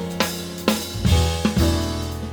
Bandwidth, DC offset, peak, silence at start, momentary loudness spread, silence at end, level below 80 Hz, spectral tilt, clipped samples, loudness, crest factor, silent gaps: over 20 kHz; under 0.1%; -2 dBFS; 0 s; 5 LU; 0 s; -28 dBFS; -5 dB/octave; under 0.1%; -22 LUFS; 18 dB; none